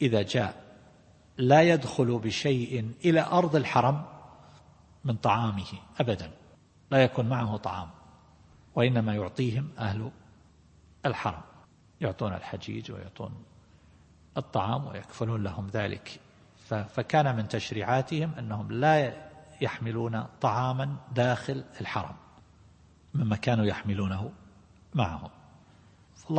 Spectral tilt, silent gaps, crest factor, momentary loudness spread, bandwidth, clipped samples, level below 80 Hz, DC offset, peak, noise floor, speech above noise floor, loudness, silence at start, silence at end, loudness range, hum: -6.5 dB/octave; none; 24 dB; 17 LU; 8.8 kHz; under 0.1%; -60 dBFS; under 0.1%; -6 dBFS; -58 dBFS; 30 dB; -29 LUFS; 0 s; 0 s; 9 LU; none